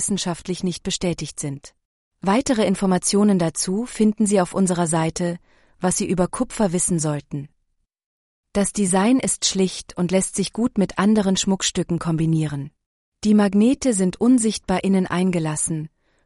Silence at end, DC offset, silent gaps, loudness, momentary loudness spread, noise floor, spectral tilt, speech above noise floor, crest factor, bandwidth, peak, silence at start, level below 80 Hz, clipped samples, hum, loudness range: 0.4 s; under 0.1%; 1.85-2.11 s, 8.06-8.44 s, 12.86-13.12 s; -21 LUFS; 10 LU; -71 dBFS; -5 dB/octave; 50 dB; 14 dB; 11.5 kHz; -6 dBFS; 0 s; -48 dBFS; under 0.1%; none; 3 LU